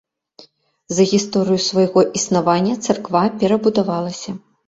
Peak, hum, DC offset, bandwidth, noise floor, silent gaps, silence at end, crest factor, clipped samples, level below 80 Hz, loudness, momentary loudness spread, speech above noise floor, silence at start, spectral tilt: -2 dBFS; none; under 0.1%; 8 kHz; -48 dBFS; none; 0.3 s; 16 dB; under 0.1%; -58 dBFS; -17 LUFS; 8 LU; 32 dB; 0.4 s; -5 dB/octave